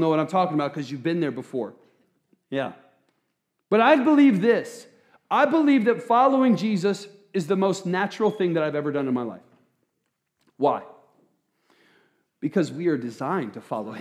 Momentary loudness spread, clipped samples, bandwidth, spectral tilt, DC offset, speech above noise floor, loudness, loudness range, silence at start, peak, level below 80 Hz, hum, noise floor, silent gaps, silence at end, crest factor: 14 LU; under 0.1%; 11 kHz; -6.5 dB/octave; under 0.1%; 55 dB; -23 LUFS; 11 LU; 0 s; -4 dBFS; -86 dBFS; none; -77 dBFS; none; 0 s; 20 dB